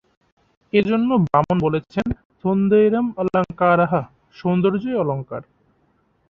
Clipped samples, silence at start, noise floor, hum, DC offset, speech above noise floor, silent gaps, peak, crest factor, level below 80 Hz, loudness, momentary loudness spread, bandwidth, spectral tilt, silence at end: under 0.1%; 0.75 s; -63 dBFS; none; under 0.1%; 44 dB; 2.25-2.30 s; -2 dBFS; 18 dB; -48 dBFS; -20 LUFS; 11 LU; 6.4 kHz; -9.5 dB/octave; 0.85 s